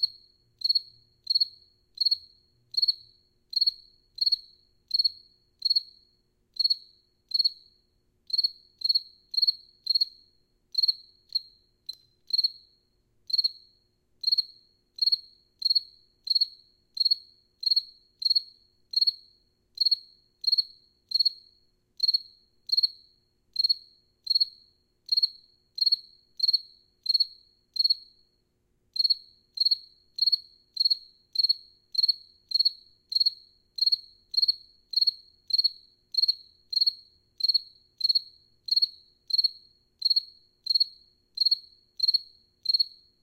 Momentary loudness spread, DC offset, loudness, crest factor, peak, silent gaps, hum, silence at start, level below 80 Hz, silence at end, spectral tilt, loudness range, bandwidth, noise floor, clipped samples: 7 LU; under 0.1%; -25 LUFS; 16 dB; -14 dBFS; none; 60 Hz at -85 dBFS; 0 s; -72 dBFS; 0.35 s; 1.5 dB/octave; 2 LU; 16 kHz; -72 dBFS; under 0.1%